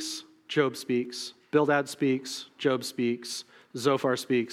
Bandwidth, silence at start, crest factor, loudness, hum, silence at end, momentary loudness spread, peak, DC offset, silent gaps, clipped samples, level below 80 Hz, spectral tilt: 16 kHz; 0 s; 18 dB; -29 LUFS; none; 0 s; 12 LU; -10 dBFS; under 0.1%; none; under 0.1%; -84 dBFS; -4.5 dB/octave